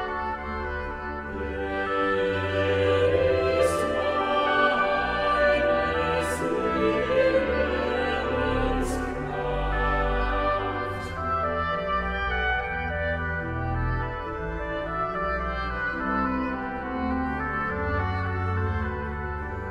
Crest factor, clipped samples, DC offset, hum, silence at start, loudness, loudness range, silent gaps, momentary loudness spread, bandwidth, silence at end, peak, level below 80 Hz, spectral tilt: 16 dB; under 0.1%; under 0.1%; none; 0 s; -26 LUFS; 5 LU; none; 9 LU; 15 kHz; 0 s; -10 dBFS; -36 dBFS; -6 dB/octave